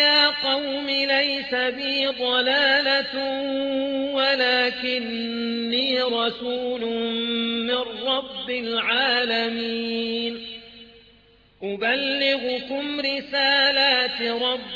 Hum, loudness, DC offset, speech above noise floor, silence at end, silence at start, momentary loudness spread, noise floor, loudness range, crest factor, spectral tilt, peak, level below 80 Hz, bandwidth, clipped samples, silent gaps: 50 Hz at -65 dBFS; -22 LUFS; under 0.1%; 32 dB; 0 s; 0 s; 9 LU; -56 dBFS; 5 LU; 18 dB; -4 dB/octave; -6 dBFS; -62 dBFS; 7.4 kHz; under 0.1%; none